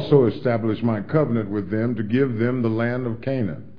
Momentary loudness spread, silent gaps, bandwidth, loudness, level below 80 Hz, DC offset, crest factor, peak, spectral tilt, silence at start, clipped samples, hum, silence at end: 6 LU; none; 5.2 kHz; -22 LUFS; -54 dBFS; 1%; 18 dB; -2 dBFS; -10.5 dB/octave; 0 s; under 0.1%; none; 0.05 s